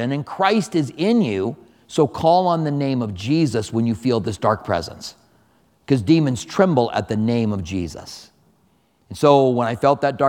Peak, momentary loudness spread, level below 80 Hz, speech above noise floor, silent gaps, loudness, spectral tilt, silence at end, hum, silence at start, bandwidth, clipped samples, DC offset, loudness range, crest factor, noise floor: 0 dBFS; 12 LU; -52 dBFS; 42 dB; none; -19 LUFS; -6.5 dB/octave; 0 s; none; 0 s; 16 kHz; under 0.1%; under 0.1%; 2 LU; 20 dB; -61 dBFS